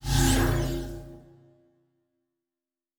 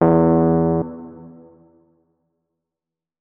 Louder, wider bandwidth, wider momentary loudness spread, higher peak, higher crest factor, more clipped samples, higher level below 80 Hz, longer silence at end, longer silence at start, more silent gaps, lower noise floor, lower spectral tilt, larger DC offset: second, -26 LUFS vs -17 LUFS; first, over 20 kHz vs 2.6 kHz; about the same, 20 LU vs 22 LU; second, -10 dBFS vs -2 dBFS; about the same, 20 dB vs 20 dB; neither; first, -34 dBFS vs -46 dBFS; about the same, 1.8 s vs 1.9 s; about the same, 0 s vs 0 s; neither; about the same, under -90 dBFS vs -88 dBFS; second, -4.5 dB/octave vs -14 dB/octave; neither